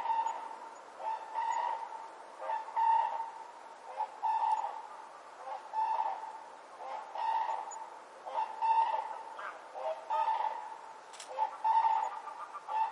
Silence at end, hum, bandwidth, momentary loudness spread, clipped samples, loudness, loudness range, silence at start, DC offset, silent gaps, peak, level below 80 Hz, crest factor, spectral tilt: 0 s; none; 11 kHz; 18 LU; under 0.1%; -35 LUFS; 3 LU; 0 s; under 0.1%; none; -20 dBFS; under -90 dBFS; 16 dB; -0.5 dB/octave